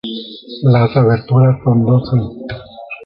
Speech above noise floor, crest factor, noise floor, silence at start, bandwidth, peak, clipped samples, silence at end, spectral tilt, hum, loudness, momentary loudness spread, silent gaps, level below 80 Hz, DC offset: 19 dB; 12 dB; -32 dBFS; 0.05 s; 5.4 kHz; -2 dBFS; under 0.1%; 0 s; -11 dB/octave; none; -13 LUFS; 17 LU; none; -44 dBFS; under 0.1%